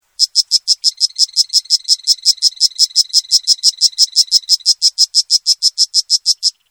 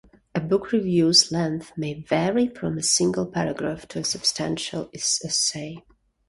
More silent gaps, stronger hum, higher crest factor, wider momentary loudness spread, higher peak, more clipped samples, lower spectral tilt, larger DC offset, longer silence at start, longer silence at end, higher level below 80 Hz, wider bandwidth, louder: neither; neither; second, 14 dB vs 22 dB; second, 3 LU vs 14 LU; first, 0 dBFS vs -4 dBFS; first, 0.2% vs under 0.1%; second, 8 dB/octave vs -3.5 dB/octave; neither; second, 0.2 s vs 0.35 s; second, 0.2 s vs 0.5 s; second, -76 dBFS vs -56 dBFS; first, over 20 kHz vs 11.5 kHz; first, -11 LUFS vs -23 LUFS